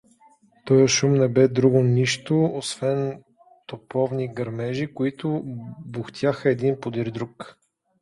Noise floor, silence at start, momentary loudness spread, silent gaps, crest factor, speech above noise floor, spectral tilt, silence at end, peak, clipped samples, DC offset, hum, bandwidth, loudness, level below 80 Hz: -57 dBFS; 0.65 s; 17 LU; none; 18 dB; 35 dB; -5.5 dB/octave; 0.5 s; -4 dBFS; under 0.1%; under 0.1%; none; 11.5 kHz; -22 LUFS; -60 dBFS